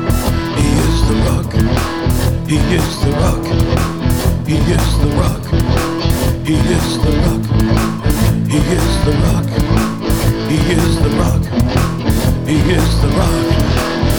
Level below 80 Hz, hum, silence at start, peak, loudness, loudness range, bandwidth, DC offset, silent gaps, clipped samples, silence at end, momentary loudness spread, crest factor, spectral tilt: -20 dBFS; none; 0 s; 0 dBFS; -14 LUFS; 1 LU; over 20 kHz; under 0.1%; none; under 0.1%; 0 s; 2 LU; 12 dB; -6 dB/octave